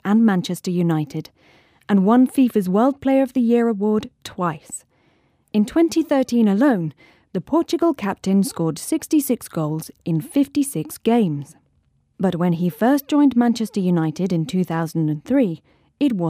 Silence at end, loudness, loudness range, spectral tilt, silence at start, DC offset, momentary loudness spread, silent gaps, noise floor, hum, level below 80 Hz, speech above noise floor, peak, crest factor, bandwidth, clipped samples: 0 s; -20 LUFS; 3 LU; -6.5 dB/octave; 0.05 s; under 0.1%; 9 LU; none; -63 dBFS; none; -60 dBFS; 44 dB; -6 dBFS; 14 dB; 16 kHz; under 0.1%